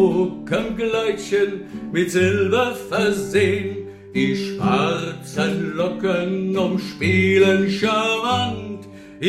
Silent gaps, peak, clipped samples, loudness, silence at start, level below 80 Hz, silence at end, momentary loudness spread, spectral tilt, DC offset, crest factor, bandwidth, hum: none; -4 dBFS; under 0.1%; -20 LUFS; 0 s; -52 dBFS; 0 s; 9 LU; -5.5 dB/octave; under 0.1%; 16 dB; 14.5 kHz; none